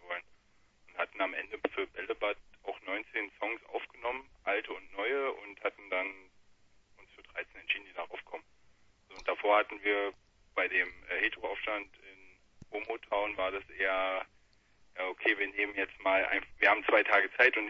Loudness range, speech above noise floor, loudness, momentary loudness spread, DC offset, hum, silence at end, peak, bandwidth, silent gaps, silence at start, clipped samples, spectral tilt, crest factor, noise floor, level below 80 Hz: 7 LU; 36 dB; -33 LUFS; 15 LU; under 0.1%; none; 0 s; -8 dBFS; 7.6 kHz; none; 0 s; under 0.1%; -4 dB/octave; 26 dB; -67 dBFS; -66 dBFS